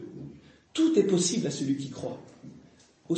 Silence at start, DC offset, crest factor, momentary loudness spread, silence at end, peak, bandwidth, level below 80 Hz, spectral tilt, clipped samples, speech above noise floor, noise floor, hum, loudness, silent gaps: 0 s; under 0.1%; 20 dB; 21 LU; 0 s; -10 dBFS; 8.8 kHz; -68 dBFS; -5 dB/octave; under 0.1%; 30 dB; -57 dBFS; none; -27 LUFS; none